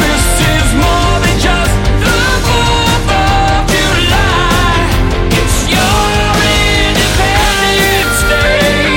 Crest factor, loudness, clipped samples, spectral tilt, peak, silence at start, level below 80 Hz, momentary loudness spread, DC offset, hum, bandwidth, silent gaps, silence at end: 10 dB; -10 LUFS; under 0.1%; -4 dB/octave; 0 dBFS; 0 s; -16 dBFS; 2 LU; under 0.1%; none; 17 kHz; none; 0 s